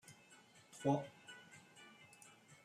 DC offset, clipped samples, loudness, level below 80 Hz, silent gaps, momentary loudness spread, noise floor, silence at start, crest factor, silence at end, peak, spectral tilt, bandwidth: under 0.1%; under 0.1%; -41 LUFS; -84 dBFS; none; 23 LU; -66 dBFS; 0.1 s; 24 dB; 0.75 s; -22 dBFS; -6 dB/octave; 15 kHz